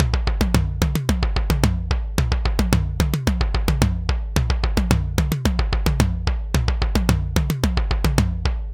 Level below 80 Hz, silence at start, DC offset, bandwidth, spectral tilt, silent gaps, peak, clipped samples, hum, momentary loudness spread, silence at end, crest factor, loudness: -22 dBFS; 0 s; 0.1%; 17 kHz; -5.5 dB/octave; none; 0 dBFS; under 0.1%; none; 3 LU; 0 s; 20 dB; -22 LUFS